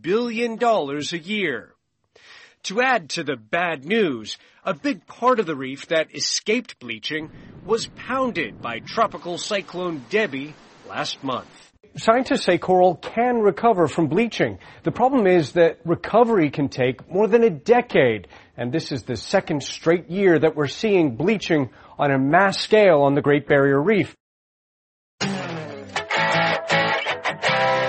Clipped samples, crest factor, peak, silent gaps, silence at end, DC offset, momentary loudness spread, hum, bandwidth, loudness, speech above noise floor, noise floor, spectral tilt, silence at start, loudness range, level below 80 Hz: under 0.1%; 20 dB; 0 dBFS; 24.20-25.18 s; 0 s; under 0.1%; 12 LU; none; 8.8 kHz; -21 LUFS; 38 dB; -59 dBFS; -5 dB/octave; 0.05 s; 6 LU; -58 dBFS